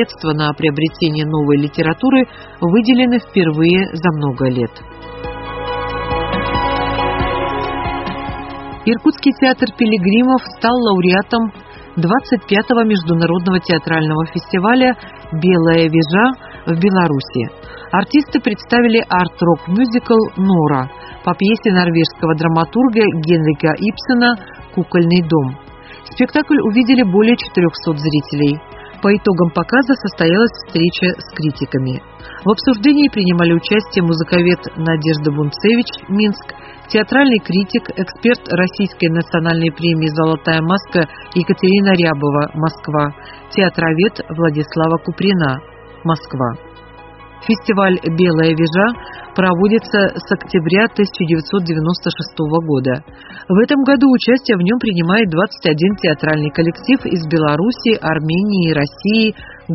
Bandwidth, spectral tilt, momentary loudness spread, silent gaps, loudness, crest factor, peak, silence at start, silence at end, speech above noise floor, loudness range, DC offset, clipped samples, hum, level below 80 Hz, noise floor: 6 kHz; -5 dB/octave; 9 LU; none; -15 LUFS; 14 dB; 0 dBFS; 0 s; 0 s; 23 dB; 3 LU; under 0.1%; under 0.1%; none; -40 dBFS; -37 dBFS